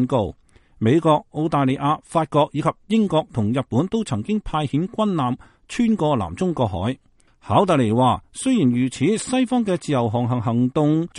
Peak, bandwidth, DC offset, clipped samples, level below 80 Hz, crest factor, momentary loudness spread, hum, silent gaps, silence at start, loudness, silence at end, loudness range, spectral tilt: -4 dBFS; 11.5 kHz; under 0.1%; under 0.1%; -48 dBFS; 16 dB; 6 LU; none; none; 0 s; -21 LUFS; 0 s; 3 LU; -6.5 dB/octave